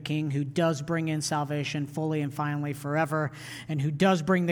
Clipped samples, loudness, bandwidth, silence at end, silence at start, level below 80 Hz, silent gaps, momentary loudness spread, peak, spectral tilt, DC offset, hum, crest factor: under 0.1%; -28 LUFS; 18 kHz; 0 s; 0 s; -64 dBFS; none; 7 LU; -12 dBFS; -6 dB/octave; under 0.1%; none; 16 dB